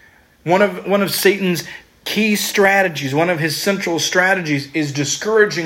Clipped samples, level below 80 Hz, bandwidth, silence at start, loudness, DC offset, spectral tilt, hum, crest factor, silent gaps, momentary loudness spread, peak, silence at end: under 0.1%; -58 dBFS; 16.5 kHz; 0.45 s; -16 LUFS; under 0.1%; -4 dB/octave; none; 16 dB; none; 7 LU; 0 dBFS; 0 s